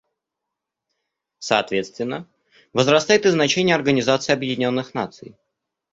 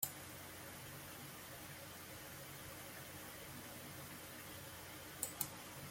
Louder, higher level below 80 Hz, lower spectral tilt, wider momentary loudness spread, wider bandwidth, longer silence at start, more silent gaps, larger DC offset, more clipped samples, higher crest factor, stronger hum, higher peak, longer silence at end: first, -20 LUFS vs -49 LUFS; first, -60 dBFS vs -72 dBFS; first, -4 dB/octave vs -2.5 dB/octave; first, 13 LU vs 7 LU; second, 8 kHz vs 16.5 kHz; first, 1.4 s vs 0 s; neither; neither; neither; second, 20 dB vs 30 dB; neither; first, -2 dBFS vs -20 dBFS; first, 0.65 s vs 0 s